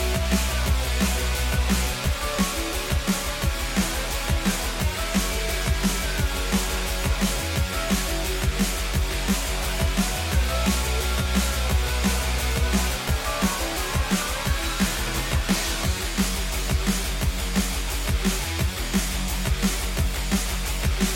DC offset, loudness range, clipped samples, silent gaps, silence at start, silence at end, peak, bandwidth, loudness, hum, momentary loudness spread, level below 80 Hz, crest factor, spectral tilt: under 0.1%; 1 LU; under 0.1%; none; 0 s; 0 s; -8 dBFS; 17 kHz; -25 LUFS; none; 3 LU; -28 dBFS; 16 dB; -4 dB/octave